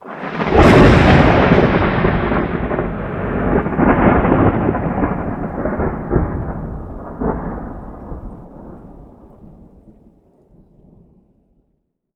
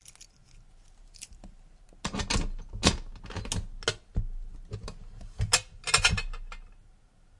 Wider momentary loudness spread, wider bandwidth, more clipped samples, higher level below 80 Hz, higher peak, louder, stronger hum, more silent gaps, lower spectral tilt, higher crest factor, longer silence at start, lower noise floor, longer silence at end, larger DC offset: about the same, 22 LU vs 22 LU; about the same, 11 kHz vs 11.5 kHz; neither; first, -26 dBFS vs -38 dBFS; about the same, 0 dBFS vs -2 dBFS; first, -15 LUFS vs -29 LUFS; neither; neither; first, -8 dB/octave vs -2.5 dB/octave; second, 16 dB vs 30 dB; second, 0.05 s vs 0.2 s; first, -68 dBFS vs -58 dBFS; first, 3.1 s vs 0.5 s; neither